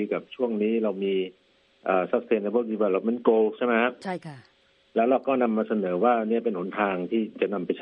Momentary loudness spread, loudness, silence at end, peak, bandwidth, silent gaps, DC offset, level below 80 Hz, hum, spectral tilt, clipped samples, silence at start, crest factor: 8 LU; -25 LUFS; 0 s; -6 dBFS; 8.6 kHz; none; under 0.1%; -74 dBFS; none; -8 dB/octave; under 0.1%; 0 s; 20 dB